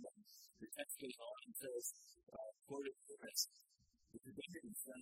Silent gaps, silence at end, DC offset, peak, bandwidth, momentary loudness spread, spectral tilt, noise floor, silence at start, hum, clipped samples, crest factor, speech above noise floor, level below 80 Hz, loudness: none; 0 s; under 0.1%; -28 dBFS; 16 kHz; 18 LU; -1.5 dB/octave; -73 dBFS; 0 s; none; under 0.1%; 24 dB; 24 dB; -88 dBFS; -49 LUFS